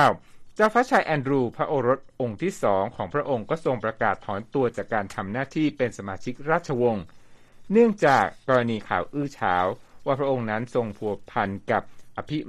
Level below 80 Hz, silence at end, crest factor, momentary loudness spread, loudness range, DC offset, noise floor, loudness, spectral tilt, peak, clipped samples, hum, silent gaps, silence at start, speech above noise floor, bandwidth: -56 dBFS; 0 s; 20 dB; 11 LU; 4 LU; under 0.1%; -46 dBFS; -25 LUFS; -6.5 dB/octave; -6 dBFS; under 0.1%; none; none; 0 s; 22 dB; 13 kHz